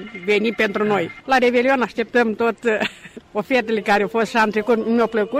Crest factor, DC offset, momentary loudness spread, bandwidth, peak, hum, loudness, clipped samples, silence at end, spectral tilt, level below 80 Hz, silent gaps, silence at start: 12 dB; under 0.1%; 4 LU; 15 kHz; -6 dBFS; none; -19 LUFS; under 0.1%; 0 s; -5 dB/octave; -56 dBFS; none; 0 s